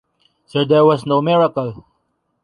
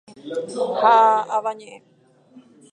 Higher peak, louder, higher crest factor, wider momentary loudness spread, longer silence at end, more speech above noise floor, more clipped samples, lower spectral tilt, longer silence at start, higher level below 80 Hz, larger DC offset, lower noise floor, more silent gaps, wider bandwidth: about the same, -2 dBFS vs -2 dBFS; first, -16 LUFS vs -19 LUFS; about the same, 16 dB vs 18 dB; second, 12 LU vs 16 LU; first, 0.65 s vs 0.35 s; first, 53 dB vs 32 dB; neither; first, -8 dB/octave vs -4 dB/octave; first, 0.55 s vs 0.25 s; first, -58 dBFS vs -80 dBFS; neither; first, -68 dBFS vs -51 dBFS; neither; about the same, 10.5 kHz vs 9.8 kHz